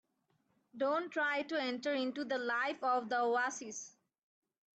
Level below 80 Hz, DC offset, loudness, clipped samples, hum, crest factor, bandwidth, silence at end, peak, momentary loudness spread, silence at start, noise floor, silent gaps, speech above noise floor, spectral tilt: -88 dBFS; under 0.1%; -36 LUFS; under 0.1%; none; 14 dB; 8.8 kHz; 0.9 s; -24 dBFS; 9 LU; 0.75 s; -79 dBFS; none; 43 dB; -2 dB/octave